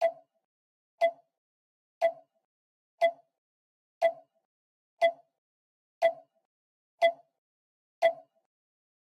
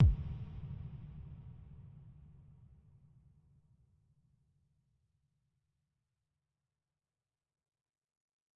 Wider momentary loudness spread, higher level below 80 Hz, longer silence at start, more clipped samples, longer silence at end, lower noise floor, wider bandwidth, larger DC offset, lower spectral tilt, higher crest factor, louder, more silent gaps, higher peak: second, 10 LU vs 19 LU; second, under -90 dBFS vs -48 dBFS; about the same, 0 s vs 0 s; neither; second, 0.9 s vs 6.45 s; about the same, under -90 dBFS vs under -90 dBFS; first, 12 kHz vs 3.6 kHz; neither; second, -1.5 dB/octave vs -11.5 dB/octave; about the same, 22 dB vs 24 dB; first, -30 LUFS vs -41 LUFS; first, 0.45-0.98 s, 1.38-2.01 s, 2.45-2.98 s, 3.38-4.01 s, 4.45-4.97 s, 5.38-6.01 s, 6.45-6.98 s, 7.38-8.02 s vs none; first, -12 dBFS vs -16 dBFS